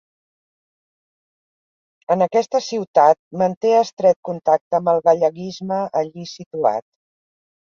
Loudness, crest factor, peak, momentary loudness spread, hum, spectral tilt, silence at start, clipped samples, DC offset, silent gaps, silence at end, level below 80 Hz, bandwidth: -19 LUFS; 18 dB; -2 dBFS; 10 LU; none; -5.5 dB/octave; 2.1 s; under 0.1%; under 0.1%; 2.88-2.94 s, 3.19-3.31 s, 3.57-3.61 s, 3.93-3.97 s, 4.16-4.23 s, 4.61-4.71 s, 6.46-6.51 s; 0.95 s; -68 dBFS; 7.2 kHz